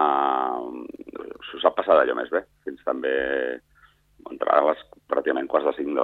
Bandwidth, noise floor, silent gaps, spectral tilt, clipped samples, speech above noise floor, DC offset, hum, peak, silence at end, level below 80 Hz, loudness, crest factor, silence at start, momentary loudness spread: 4.5 kHz; -58 dBFS; none; -6 dB/octave; under 0.1%; 35 dB; under 0.1%; 50 Hz at -65 dBFS; -4 dBFS; 0 s; -62 dBFS; -24 LUFS; 22 dB; 0 s; 19 LU